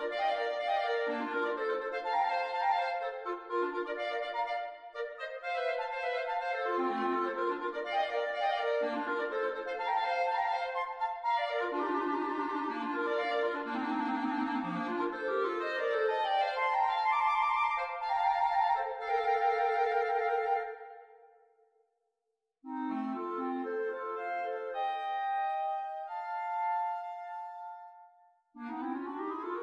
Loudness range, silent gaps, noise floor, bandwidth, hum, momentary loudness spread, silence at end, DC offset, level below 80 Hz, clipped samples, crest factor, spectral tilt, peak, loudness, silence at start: 8 LU; none; -85 dBFS; 10 kHz; none; 9 LU; 0 s; under 0.1%; -74 dBFS; under 0.1%; 16 dB; -5 dB/octave; -18 dBFS; -33 LUFS; 0 s